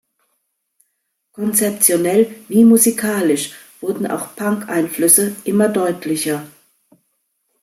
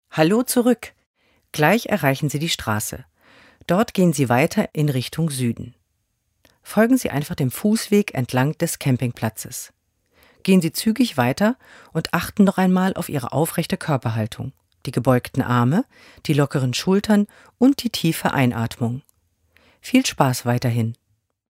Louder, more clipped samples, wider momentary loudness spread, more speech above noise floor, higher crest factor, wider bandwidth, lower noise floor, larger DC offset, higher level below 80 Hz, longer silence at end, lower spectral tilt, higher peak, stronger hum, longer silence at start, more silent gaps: first, -16 LUFS vs -20 LUFS; neither; about the same, 12 LU vs 12 LU; first, 55 dB vs 51 dB; about the same, 18 dB vs 20 dB; about the same, 16.5 kHz vs 16 kHz; about the same, -71 dBFS vs -71 dBFS; neither; second, -64 dBFS vs -54 dBFS; first, 1.15 s vs 0.6 s; second, -4 dB/octave vs -5.5 dB/octave; about the same, 0 dBFS vs 0 dBFS; neither; first, 1.4 s vs 0.15 s; second, none vs 1.06-1.14 s